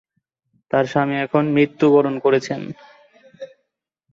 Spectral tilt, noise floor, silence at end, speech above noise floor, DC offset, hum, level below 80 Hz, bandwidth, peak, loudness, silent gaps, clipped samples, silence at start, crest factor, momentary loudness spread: -7 dB/octave; -75 dBFS; 0.65 s; 57 dB; under 0.1%; none; -64 dBFS; 7.6 kHz; -4 dBFS; -18 LUFS; none; under 0.1%; 0.75 s; 16 dB; 24 LU